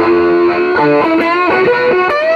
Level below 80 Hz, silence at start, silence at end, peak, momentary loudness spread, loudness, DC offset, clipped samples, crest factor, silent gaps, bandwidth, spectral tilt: -48 dBFS; 0 s; 0 s; 0 dBFS; 1 LU; -11 LUFS; under 0.1%; under 0.1%; 10 dB; none; 6.4 kHz; -7 dB/octave